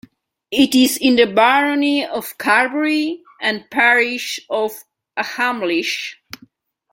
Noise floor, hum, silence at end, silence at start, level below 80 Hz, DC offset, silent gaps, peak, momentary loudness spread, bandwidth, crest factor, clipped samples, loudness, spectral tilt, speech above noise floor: -52 dBFS; none; 0.8 s; 0.5 s; -62 dBFS; under 0.1%; none; -2 dBFS; 12 LU; 16.5 kHz; 18 dB; under 0.1%; -17 LUFS; -2.5 dB/octave; 35 dB